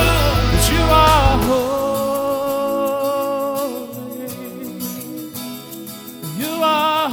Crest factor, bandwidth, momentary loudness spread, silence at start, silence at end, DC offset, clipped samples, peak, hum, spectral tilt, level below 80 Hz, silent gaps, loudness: 18 dB; over 20 kHz; 17 LU; 0 s; 0 s; under 0.1%; under 0.1%; 0 dBFS; none; -4.5 dB/octave; -26 dBFS; none; -18 LUFS